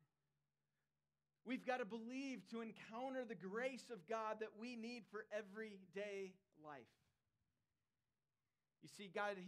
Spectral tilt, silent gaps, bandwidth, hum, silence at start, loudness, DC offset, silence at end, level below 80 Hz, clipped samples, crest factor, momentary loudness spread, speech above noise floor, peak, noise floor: -5 dB/octave; none; 13.5 kHz; none; 1.45 s; -50 LUFS; under 0.1%; 0 s; under -90 dBFS; under 0.1%; 22 dB; 13 LU; over 40 dB; -30 dBFS; under -90 dBFS